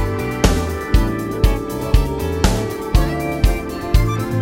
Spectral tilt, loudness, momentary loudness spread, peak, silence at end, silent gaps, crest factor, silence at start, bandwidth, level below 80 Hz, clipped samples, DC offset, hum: -6 dB/octave; -19 LUFS; 4 LU; 0 dBFS; 0 s; none; 16 dB; 0 s; 16.5 kHz; -20 dBFS; under 0.1%; under 0.1%; none